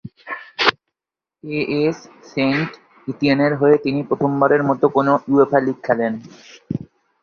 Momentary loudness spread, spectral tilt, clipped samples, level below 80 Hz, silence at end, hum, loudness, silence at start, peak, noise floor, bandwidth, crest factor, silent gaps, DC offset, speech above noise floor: 16 LU; -7 dB/octave; under 0.1%; -58 dBFS; 0.4 s; none; -18 LUFS; 0.05 s; 0 dBFS; -88 dBFS; 6.8 kHz; 18 dB; none; under 0.1%; 70 dB